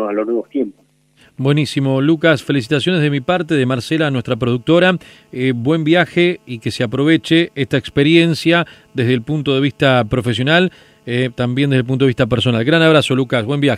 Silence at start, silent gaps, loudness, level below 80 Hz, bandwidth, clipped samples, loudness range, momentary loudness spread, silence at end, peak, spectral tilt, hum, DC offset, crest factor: 0 s; none; -15 LUFS; -48 dBFS; 13 kHz; under 0.1%; 2 LU; 8 LU; 0 s; 0 dBFS; -6.5 dB/octave; none; under 0.1%; 16 dB